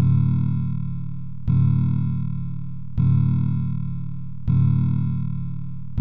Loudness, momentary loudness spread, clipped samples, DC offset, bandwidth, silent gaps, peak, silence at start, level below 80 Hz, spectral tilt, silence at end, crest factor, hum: -23 LUFS; 12 LU; under 0.1%; 3%; 3.6 kHz; none; -10 dBFS; 0 s; -40 dBFS; -12.5 dB/octave; 0 s; 12 dB; none